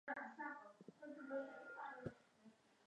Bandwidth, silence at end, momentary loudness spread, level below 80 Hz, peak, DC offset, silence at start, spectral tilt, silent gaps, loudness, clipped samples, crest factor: 10 kHz; 0 s; 19 LU; -82 dBFS; -34 dBFS; under 0.1%; 0.05 s; -7 dB/octave; none; -53 LUFS; under 0.1%; 20 dB